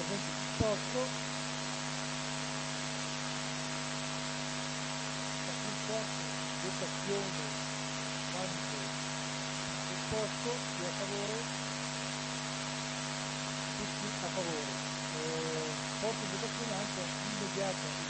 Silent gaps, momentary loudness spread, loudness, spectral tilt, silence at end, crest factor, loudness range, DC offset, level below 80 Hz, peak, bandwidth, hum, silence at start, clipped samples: none; 2 LU; -36 LUFS; -3 dB/octave; 0 s; 20 dB; 1 LU; under 0.1%; -62 dBFS; -16 dBFS; 8.8 kHz; none; 0 s; under 0.1%